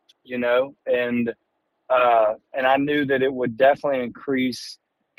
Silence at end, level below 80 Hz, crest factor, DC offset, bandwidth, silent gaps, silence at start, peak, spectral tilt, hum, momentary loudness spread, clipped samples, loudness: 0.45 s; -64 dBFS; 18 dB; under 0.1%; 15 kHz; none; 0.3 s; -4 dBFS; -5.5 dB/octave; none; 9 LU; under 0.1%; -22 LUFS